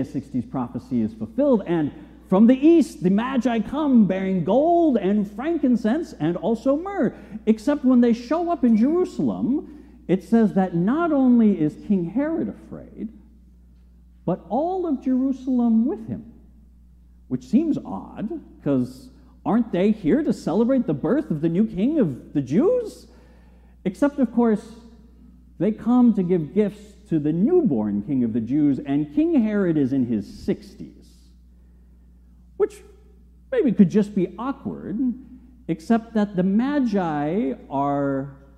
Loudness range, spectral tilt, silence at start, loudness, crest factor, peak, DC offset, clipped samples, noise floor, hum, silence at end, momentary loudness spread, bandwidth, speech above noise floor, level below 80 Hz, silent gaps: 6 LU; -8.5 dB/octave; 0 s; -22 LUFS; 18 dB; -4 dBFS; under 0.1%; under 0.1%; -50 dBFS; none; 0.2 s; 12 LU; 9.6 kHz; 29 dB; -50 dBFS; none